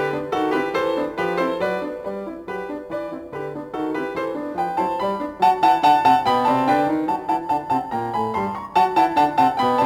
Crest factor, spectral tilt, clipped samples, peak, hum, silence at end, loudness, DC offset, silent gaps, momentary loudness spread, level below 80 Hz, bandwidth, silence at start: 16 dB; -5.5 dB/octave; under 0.1%; -6 dBFS; none; 0 s; -21 LUFS; under 0.1%; none; 13 LU; -56 dBFS; 18.5 kHz; 0 s